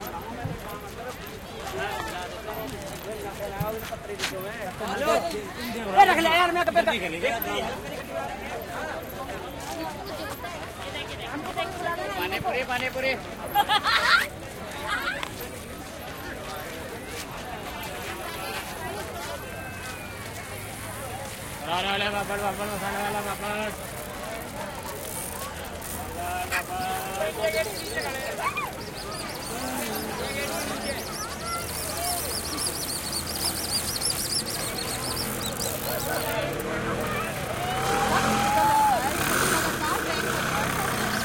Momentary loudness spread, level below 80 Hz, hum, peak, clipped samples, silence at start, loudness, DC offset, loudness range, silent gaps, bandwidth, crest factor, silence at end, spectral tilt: 13 LU; -48 dBFS; none; -4 dBFS; under 0.1%; 0 s; -28 LUFS; under 0.1%; 10 LU; none; 17 kHz; 24 dB; 0 s; -3 dB/octave